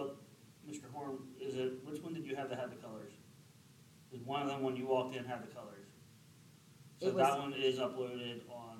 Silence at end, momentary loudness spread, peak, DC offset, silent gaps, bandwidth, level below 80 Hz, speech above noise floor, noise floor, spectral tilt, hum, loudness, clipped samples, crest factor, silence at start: 0 s; 22 LU; -20 dBFS; under 0.1%; none; 16 kHz; -84 dBFS; 24 dB; -62 dBFS; -5 dB/octave; none; -39 LUFS; under 0.1%; 22 dB; 0 s